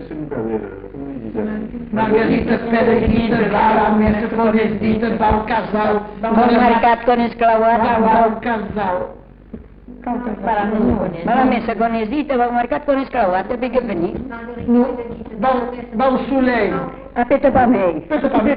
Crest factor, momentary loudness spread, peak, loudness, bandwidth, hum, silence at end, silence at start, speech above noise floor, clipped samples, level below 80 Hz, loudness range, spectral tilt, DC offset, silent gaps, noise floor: 14 dB; 11 LU; -2 dBFS; -17 LUFS; 5.2 kHz; none; 0 s; 0 s; 21 dB; under 0.1%; -36 dBFS; 4 LU; -11.5 dB/octave; under 0.1%; none; -37 dBFS